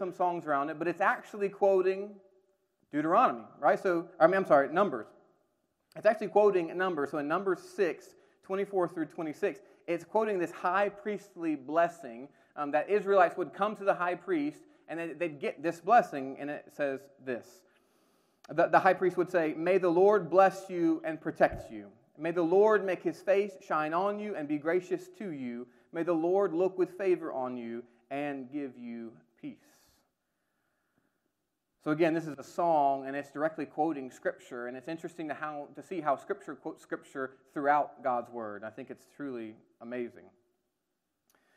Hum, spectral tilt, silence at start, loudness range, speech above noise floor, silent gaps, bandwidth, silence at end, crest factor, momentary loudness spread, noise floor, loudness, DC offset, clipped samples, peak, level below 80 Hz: none; -6.5 dB/octave; 0 s; 9 LU; 53 dB; none; 13 kHz; 1.35 s; 24 dB; 16 LU; -83 dBFS; -31 LUFS; under 0.1%; under 0.1%; -8 dBFS; -72 dBFS